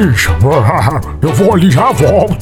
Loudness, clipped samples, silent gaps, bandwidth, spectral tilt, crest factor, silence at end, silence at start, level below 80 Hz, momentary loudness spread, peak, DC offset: -10 LUFS; under 0.1%; none; 17 kHz; -6.5 dB/octave; 10 dB; 0 s; 0 s; -24 dBFS; 6 LU; 0 dBFS; under 0.1%